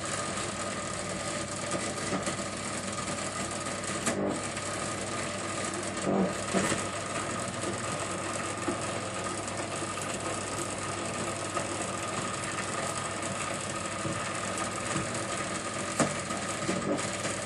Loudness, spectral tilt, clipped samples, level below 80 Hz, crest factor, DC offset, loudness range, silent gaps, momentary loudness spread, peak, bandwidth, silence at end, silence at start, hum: -32 LUFS; -3.5 dB/octave; under 0.1%; -58 dBFS; 22 dB; under 0.1%; 2 LU; none; 4 LU; -10 dBFS; 12 kHz; 0 s; 0 s; none